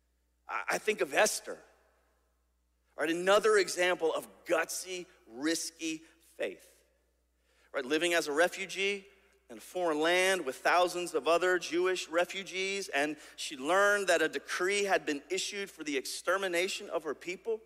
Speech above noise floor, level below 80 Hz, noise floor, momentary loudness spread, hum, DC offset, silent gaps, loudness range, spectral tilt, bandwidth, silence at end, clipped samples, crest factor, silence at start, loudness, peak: 43 dB; -76 dBFS; -75 dBFS; 12 LU; none; under 0.1%; none; 5 LU; -2 dB/octave; 16 kHz; 0.1 s; under 0.1%; 20 dB; 0.5 s; -31 LUFS; -14 dBFS